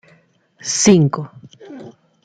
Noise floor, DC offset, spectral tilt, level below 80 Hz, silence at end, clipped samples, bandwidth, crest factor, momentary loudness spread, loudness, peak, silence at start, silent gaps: -55 dBFS; under 0.1%; -4.5 dB/octave; -60 dBFS; 0.35 s; under 0.1%; 9.6 kHz; 18 dB; 25 LU; -15 LUFS; -2 dBFS; 0.65 s; none